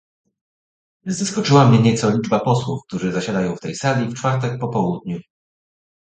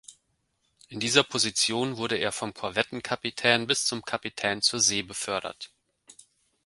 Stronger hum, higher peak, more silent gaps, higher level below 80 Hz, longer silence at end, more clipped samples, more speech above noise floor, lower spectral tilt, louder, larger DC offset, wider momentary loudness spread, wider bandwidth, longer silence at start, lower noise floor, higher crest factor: neither; about the same, 0 dBFS vs -2 dBFS; neither; first, -54 dBFS vs -64 dBFS; first, 0.8 s vs 0.55 s; neither; first, over 72 dB vs 46 dB; first, -6 dB/octave vs -2 dB/octave; first, -19 LUFS vs -26 LUFS; neither; first, 13 LU vs 10 LU; second, 9.2 kHz vs 12 kHz; first, 1.05 s vs 0.1 s; first, under -90 dBFS vs -74 dBFS; second, 20 dB vs 26 dB